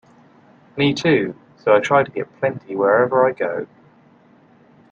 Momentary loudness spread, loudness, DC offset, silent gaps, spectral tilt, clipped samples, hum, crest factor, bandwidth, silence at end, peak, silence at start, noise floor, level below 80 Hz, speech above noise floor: 13 LU; -19 LUFS; under 0.1%; none; -6 dB/octave; under 0.1%; none; 18 dB; 7.6 kHz; 1.25 s; -2 dBFS; 0.75 s; -52 dBFS; -62 dBFS; 34 dB